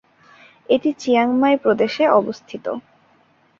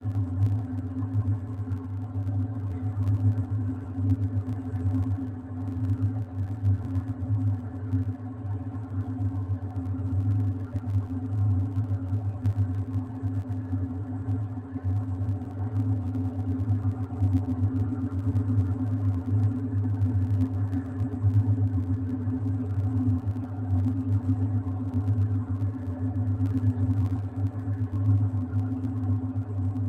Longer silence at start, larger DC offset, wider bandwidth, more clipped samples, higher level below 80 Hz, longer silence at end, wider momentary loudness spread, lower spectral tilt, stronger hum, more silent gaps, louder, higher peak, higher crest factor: first, 0.7 s vs 0 s; neither; first, 7.4 kHz vs 2.3 kHz; neither; second, -64 dBFS vs -48 dBFS; first, 0.8 s vs 0 s; first, 13 LU vs 6 LU; second, -5.5 dB/octave vs -11 dB/octave; neither; neither; first, -18 LUFS vs -29 LUFS; first, -2 dBFS vs -12 dBFS; about the same, 18 dB vs 14 dB